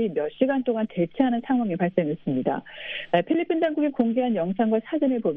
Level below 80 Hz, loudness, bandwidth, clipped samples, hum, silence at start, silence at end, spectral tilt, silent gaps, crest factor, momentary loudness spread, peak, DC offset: -64 dBFS; -25 LUFS; 3.9 kHz; under 0.1%; none; 0 s; 0 s; -10 dB/octave; none; 18 dB; 4 LU; -6 dBFS; under 0.1%